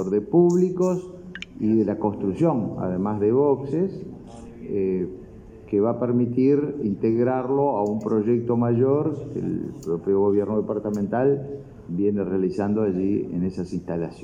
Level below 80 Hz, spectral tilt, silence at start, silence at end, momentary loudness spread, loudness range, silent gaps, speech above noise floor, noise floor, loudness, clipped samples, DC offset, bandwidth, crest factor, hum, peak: -54 dBFS; -9 dB/octave; 0 s; 0 s; 10 LU; 3 LU; none; 20 dB; -43 dBFS; -23 LUFS; under 0.1%; under 0.1%; 9 kHz; 16 dB; none; -8 dBFS